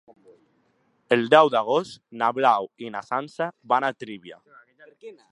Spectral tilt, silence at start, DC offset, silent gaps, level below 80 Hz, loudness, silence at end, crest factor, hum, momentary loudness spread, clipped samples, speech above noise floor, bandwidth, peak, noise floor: -5 dB/octave; 1.1 s; under 0.1%; none; -78 dBFS; -22 LUFS; 0.2 s; 24 dB; none; 20 LU; under 0.1%; 44 dB; 11 kHz; -2 dBFS; -67 dBFS